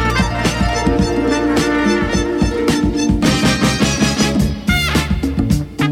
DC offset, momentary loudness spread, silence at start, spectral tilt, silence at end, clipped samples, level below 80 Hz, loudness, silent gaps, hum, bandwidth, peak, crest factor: under 0.1%; 3 LU; 0 s; -5 dB/octave; 0 s; under 0.1%; -24 dBFS; -15 LUFS; none; none; 17.5 kHz; -2 dBFS; 12 dB